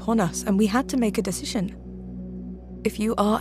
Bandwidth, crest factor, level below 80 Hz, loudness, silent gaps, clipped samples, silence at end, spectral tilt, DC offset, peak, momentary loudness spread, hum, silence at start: 15.5 kHz; 18 dB; -44 dBFS; -24 LUFS; none; under 0.1%; 0 s; -5.5 dB/octave; under 0.1%; -6 dBFS; 15 LU; none; 0 s